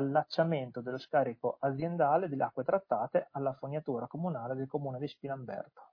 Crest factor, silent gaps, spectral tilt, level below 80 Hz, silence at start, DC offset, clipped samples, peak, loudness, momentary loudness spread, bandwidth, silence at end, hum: 18 dB; none; -9 dB/octave; -76 dBFS; 0 s; under 0.1%; under 0.1%; -14 dBFS; -34 LUFS; 10 LU; 5.4 kHz; 0.05 s; none